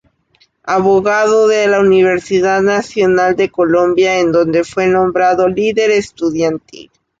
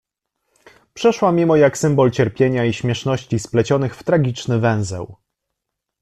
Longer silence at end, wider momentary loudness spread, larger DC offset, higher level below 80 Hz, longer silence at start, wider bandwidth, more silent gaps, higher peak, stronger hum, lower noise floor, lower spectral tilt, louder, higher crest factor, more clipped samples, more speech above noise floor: second, 0.4 s vs 0.9 s; second, 5 LU vs 8 LU; neither; about the same, -50 dBFS vs -52 dBFS; second, 0.65 s vs 0.95 s; second, 7.8 kHz vs 13 kHz; neither; about the same, -2 dBFS vs -4 dBFS; neither; second, -55 dBFS vs -80 dBFS; about the same, -5.5 dB/octave vs -6.5 dB/octave; first, -12 LUFS vs -18 LUFS; second, 10 dB vs 16 dB; neither; second, 43 dB vs 63 dB